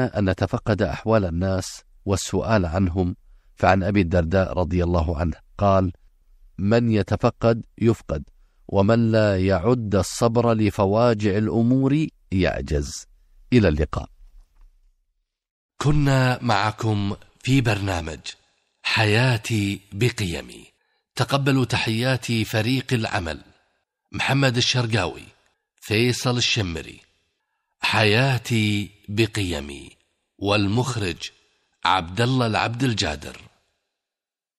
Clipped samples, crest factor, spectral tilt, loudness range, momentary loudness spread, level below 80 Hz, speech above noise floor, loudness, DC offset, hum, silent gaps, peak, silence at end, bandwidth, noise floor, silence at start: under 0.1%; 20 dB; -5.5 dB/octave; 4 LU; 12 LU; -40 dBFS; 69 dB; -22 LUFS; under 0.1%; none; 15.51-15.69 s; -4 dBFS; 1.2 s; 15 kHz; -90 dBFS; 0 s